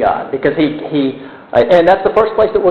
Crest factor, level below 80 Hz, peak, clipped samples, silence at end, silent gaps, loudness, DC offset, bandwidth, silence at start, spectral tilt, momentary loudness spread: 12 dB; -42 dBFS; 0 dBFS; under 0.1%; 0 s; none; -13 LUFS; under 0.1%; 6.8 kHz; 0 s; -7.5 dB/octave; 8 LU